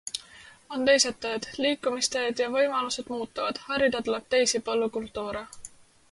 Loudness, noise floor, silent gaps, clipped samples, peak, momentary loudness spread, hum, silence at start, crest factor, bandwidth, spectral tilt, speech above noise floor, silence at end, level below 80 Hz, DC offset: -27 LUFS; -51 dBFS; none; under 0.1%; -8 dBFS; 14 LU; none; 0.05 s; 20 dB; 11.5 kHz; -1.5 dB/octave; 24 dB; 0.45 s; -60 dBFS; under 0.1%